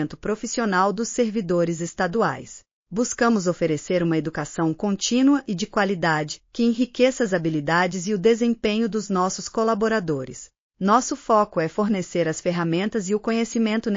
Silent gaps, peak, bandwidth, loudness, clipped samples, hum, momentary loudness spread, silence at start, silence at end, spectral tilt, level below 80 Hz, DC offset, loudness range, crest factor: 2.73-2.85 s, 10.60-10.70 s; -6 dBFS; 7.4 kHz; -23 LUFS; under 0.1%; none; 6 LU; 0 s; 0 s; -5 dB/octave; -54 dBFS; under 0.1%; 2 LU; 16 dB